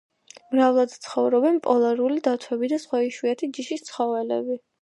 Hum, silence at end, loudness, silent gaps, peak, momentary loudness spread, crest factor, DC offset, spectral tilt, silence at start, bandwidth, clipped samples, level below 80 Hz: none; 0.25 s; -23 LUFS; none; -6 dBFS; 9 LU; 16 dB; under 0.1%; -4.5 dB/octave; 0.5 s; 11.5 kHz; under 0.1%; -78 dBFS